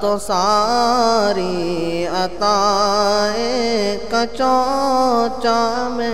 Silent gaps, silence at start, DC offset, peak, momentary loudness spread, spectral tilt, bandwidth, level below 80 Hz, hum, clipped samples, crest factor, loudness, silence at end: none; 0 s; 3%; -4 dBFS; 6 LU; -3.5 dB/octave; 16 kHz; -44 dBFS; none; under 0.1%; 12 dB; -17 LUFS; 0 s